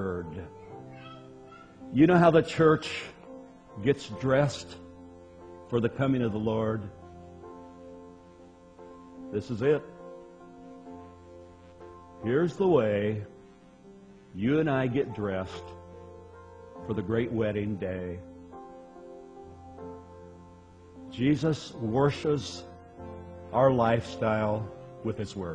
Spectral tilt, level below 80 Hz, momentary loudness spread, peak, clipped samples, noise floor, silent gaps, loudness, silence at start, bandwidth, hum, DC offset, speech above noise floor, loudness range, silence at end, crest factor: -7 dB/octave; -58 dBFS; 25 LU; -8 dBFS; under 0.1%; -53 dBFS; none; -28 LUFS; 0 s; 10 kHz; none; under 0.1%; 26 dB; 9 LU; 0 s; 22 dB